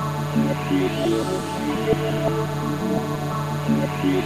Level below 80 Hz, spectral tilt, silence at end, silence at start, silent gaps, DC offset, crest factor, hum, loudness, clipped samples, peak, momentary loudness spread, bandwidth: -46 dBFS; -6.5 dB/octave; 0 s; 0 s; none; 0.4%; 16 dB; none; -23 LUFS; under 0.1%; -6 dBFS; 4 LU; 16 kHz